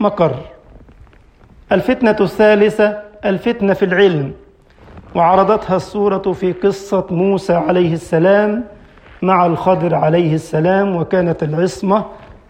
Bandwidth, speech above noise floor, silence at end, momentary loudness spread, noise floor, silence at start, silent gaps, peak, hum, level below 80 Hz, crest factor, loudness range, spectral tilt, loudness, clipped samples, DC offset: 15 kHz; 31 dB; 0.15 s; 7 LU; -45 dBFS; 0 s; none; 0 dBFS; none; -46 dBFS; 14 dB; 2 LU; -7.5 dB/octave; -15 LUFS; under 0.1%; under 0.1%